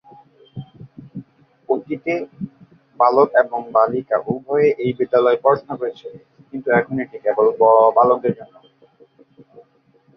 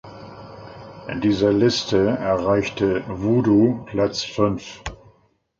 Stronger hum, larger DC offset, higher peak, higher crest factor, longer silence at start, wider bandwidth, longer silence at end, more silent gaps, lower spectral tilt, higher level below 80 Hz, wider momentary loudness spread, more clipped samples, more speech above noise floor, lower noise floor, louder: neither; neither; about the same, -2 dBFS vs -4 dBFS; about the same, 18 dB vs 18 dB; first, 0.55 s vs 0.05 s; second, 6 kHz vs 7.6 kHz; first, 1.7 s vs 0.65 s; neither; first, -9 dB/octave vs -6 dB/octave; second, -64 dBFS vs -46 dBFS; about the same, 23 LU vs 22 LU; neither; about the same, 40 dB vs 40 dB; about the same, -57 dBFS vs -60 dBFS; about the same, -18 LUFS vs -20 LUFS